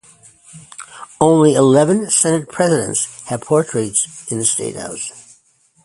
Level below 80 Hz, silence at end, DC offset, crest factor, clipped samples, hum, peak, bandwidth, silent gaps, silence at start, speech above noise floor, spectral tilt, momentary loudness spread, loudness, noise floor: -56 dBFS; 0.65 s; under 0.1%; 16 dB; under 0.1%; none; 0 dBFS; 11.5 kHz; none; 0.55 s; 40 dB; -4.5 dB/octave; 19 LU; -16 LUFS; -56 dBFS